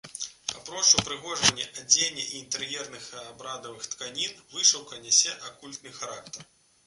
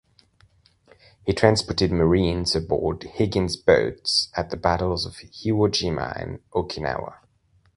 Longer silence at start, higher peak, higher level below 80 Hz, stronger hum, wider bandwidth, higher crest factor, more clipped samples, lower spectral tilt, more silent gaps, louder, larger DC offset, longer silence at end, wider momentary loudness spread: second, 0.05 s vs 1.25 s; about the same, -2 dBFS vs -2 dBFS; second, -62 dBFS vs -40 dBFS; neither; about the same, 11.5 kHz vs 11.5 kHz; about the same, 26 dB vs 22 dB; neither; second, 0.5 dB/octave vs -5 dB/octave; neither; about the same, -24 LUFS vs -23 LUFS; neither; second, 0.45 s vs 0.6 s; first, 19 LU vs 11 LU